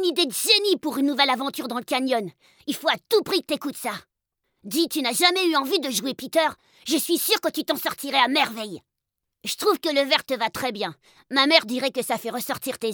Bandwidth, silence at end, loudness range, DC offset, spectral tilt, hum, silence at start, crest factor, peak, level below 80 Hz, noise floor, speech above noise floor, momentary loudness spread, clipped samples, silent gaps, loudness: over 20 kHz; 0 s; 3 LU; under 0.1%; -2 dB/octave; none; 0 s; 22 dB; -4 dBFS; -70 dBFS; -83 dBFS; 59 dB; 13 LU; under 0.1%; none; -23 LUFS